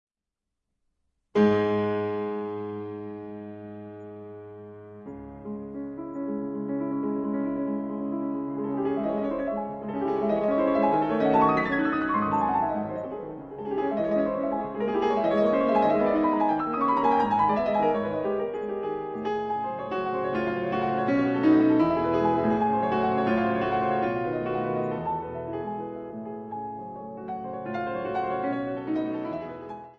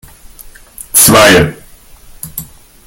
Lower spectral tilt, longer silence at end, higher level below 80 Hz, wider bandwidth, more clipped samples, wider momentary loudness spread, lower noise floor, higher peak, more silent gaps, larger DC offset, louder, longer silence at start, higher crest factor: first, -8.5 dB/octave vs -3 dB/octave; second, 0.05 s vs 0.4 s; second, -58 dBFS vs -34 dBFS; second, 6.6 kHz vs over 20 kHz; second, under 0.1% vs 0.8%; second, 15 LU vs 22 LU; first, -86 dBFS vs -37 dBFS; second, -10 dBFS vs 0 dBFS; neither; neither; second, -27 LUFS vs -6 LUFS; first, 1.35 s vs 0.8 s; about the same, 16 dB vs 12 dB